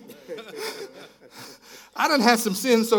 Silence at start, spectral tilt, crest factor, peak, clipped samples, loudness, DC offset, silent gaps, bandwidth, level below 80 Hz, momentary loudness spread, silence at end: 0.1 s; -3.5 dB/octave; 24 dB; -2 dBFS; under 0.1%; -22 LUFS; under 0.1%; none; 18 kHz; -76 dBFS; 24 LU; 0 s